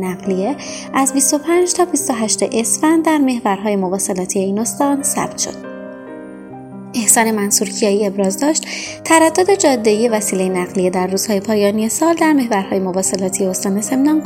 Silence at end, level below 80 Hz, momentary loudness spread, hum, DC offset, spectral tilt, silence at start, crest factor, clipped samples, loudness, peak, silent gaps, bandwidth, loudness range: 0 s; -56 dBFS; 11 LU; none; under 0.1%; -3.5 dB/octave; 0 s; 16 dB; under 0.1%; -15 LUFS; 0 dBFS; none; 16.5 kHz; 3 LU